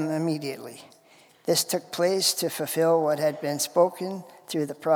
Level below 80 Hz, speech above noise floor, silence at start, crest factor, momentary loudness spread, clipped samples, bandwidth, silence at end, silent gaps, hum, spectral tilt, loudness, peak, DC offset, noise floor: -84 dBFS; 31 dB; 0 s; 18 dB; 13 LU; under 0.1%; over 20 kHz; 0 s; none; none; -3.5 dB/octave; -25 LUFS; -8 dBFS; under 0.1%; -56 dBFS